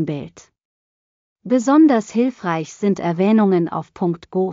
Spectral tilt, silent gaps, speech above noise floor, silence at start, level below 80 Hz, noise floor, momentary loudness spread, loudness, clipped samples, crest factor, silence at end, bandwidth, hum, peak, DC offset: -7 dB/octave; 0.65-1.36 s; over 72 dB; 0 s; -62 dBFS; under -90 dBFS; 12 LU; -18 LUFS; under 0.1%; 14 dB; 0 s; 7.6 kHz; none; -4 dBFS; under 0.1%